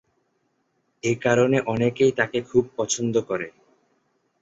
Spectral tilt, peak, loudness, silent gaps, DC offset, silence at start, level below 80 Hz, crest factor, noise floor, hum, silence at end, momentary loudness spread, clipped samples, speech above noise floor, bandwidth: -5 dB/octave; -4 dBFS; -23 LUFS; none; under 0.1%; 1.05 s; -60 dBFS; 20 dB; -71 dBFS; none; 0.9 s; 10 LU; under 0.1%; 49 dB; 8 kHz